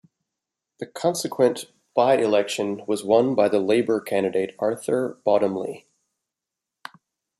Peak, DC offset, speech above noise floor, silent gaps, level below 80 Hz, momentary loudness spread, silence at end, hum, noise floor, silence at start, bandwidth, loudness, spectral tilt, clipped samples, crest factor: -4 dBFS; under 0.1%; 64 dB; none; -72 dBFS; 18 LU; 1.6 s; none; -86 dBFS; 0.8 s; 14.5 kHz; -22 LUFS; -5 dB/octave; under 0.1%; 20 dB